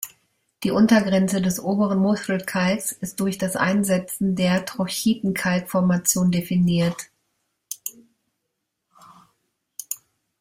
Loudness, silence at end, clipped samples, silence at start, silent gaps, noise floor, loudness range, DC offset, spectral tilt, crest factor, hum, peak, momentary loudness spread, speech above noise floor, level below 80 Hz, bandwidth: -22 LUFS; 0.45 s; under 0.1%; 0 s; none; -78 dBFS; 9 LU; under 0.1%; -5 dB/octave; 18 dB; none; -6 dBFS; 14 LU; 57 dB; -58 dBFS; 16 kHz